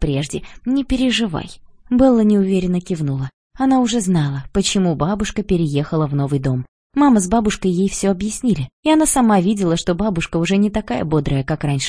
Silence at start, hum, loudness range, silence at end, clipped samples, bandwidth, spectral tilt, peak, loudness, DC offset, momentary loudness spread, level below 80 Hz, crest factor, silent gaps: 0 s; none; 2 LU; 0 s; under 0.1%; 10.5 kHz; -5.5 dB/octave; -2 dBFS; -18 LUFS; under 0.1%; 8 LU; -36 dBFS; 16 dB; 3.34-3.50 s, 6.68-6.90 s, 8.73-8.83 s